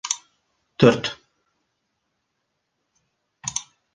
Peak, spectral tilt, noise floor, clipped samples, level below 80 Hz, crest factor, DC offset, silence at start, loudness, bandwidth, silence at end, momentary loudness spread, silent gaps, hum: -2 dBFS; -4.5 dB/octave; -76 dBFS; under 0.1%; -60 dBFS; 24 dB; under 0.1%; 0.05 s; -22 LUFS; 10 kHz; 0.35 s; 21 LU; none; none